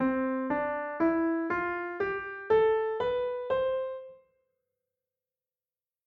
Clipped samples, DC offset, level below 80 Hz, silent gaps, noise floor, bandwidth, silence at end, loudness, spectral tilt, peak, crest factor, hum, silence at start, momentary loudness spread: under 0.1%; under 0.1%; -62 dBFS; none; under -90 dBFS; 5.6 kHz; 1.9 s; -30 LUFS; -8 dB/octave; -14 dBFS; 16 dB; none; 0 s; 8 LU